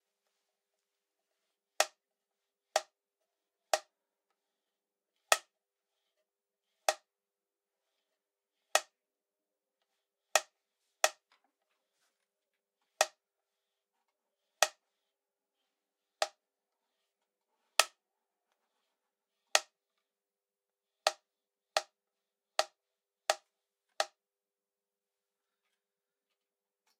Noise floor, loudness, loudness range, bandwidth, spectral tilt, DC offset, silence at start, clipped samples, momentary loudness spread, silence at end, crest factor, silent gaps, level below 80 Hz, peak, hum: under -90 dBFS; -34 LUFS; 5 LU; 15.5 kHz; 3.5 dB/octave; under 0.1%; 1.8 s; under 0.1%; 7 LU; 2.95 s; 38 dB; none; under -90 dBFS; -2 dBFS; none